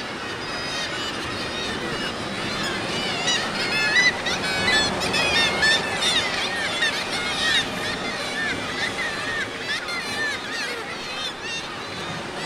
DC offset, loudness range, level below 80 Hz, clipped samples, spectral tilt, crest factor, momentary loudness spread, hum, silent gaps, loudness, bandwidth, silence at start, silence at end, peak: under 0.1%; 7 LU; -50 dBFS; under 0.1%; -2 dB/octave; 18 dB; 10 LU; none; none; -23 LUFS; 16 kHz; 0 s; 0 s; -6 dBFS